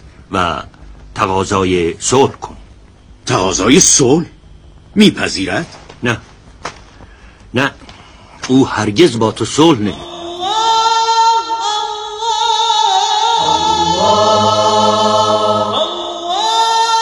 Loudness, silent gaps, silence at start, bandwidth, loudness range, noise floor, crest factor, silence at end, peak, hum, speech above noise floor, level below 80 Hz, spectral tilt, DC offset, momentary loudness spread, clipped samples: -13 LUFS; none; 0.05 s; over 20 kHz; 6 LU; -41 dBFS; 14 dB; 0 s; 0 dBFS; none; 28 dB; -42 dBFS; -3.5 dB/octave; under 0.1%; 12 LU; 0.2%